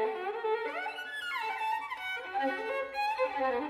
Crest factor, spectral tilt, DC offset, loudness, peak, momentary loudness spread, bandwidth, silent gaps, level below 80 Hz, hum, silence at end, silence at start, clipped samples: 14 dB; -2.5 dB/octave; under 0.1%; -34 LUFS; -18 dBFS; 5 LU; 15 kHz; none; -72 dBFS; none; 0 s; 0 s; under 0.1%